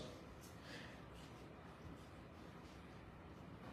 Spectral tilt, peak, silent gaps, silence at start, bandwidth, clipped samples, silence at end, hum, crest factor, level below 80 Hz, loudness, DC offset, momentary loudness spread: -5.5 dB/octave; -42 dBFS; none; 0 s; 15 kHz; under 0.1%; 0 s; none; 14 dB; -66 dBFS; -57 LUFS; under 0.1%; 4 LU